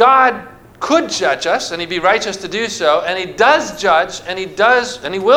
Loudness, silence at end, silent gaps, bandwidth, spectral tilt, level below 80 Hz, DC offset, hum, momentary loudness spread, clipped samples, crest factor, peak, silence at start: -15 LUFS; 0 s; none; 16 kHz; -2.5 dB/octave; -50 dBFS; under 0.1%; none; 9 LU; under 0.1%; 14 dB; 0 dBFS; 0 s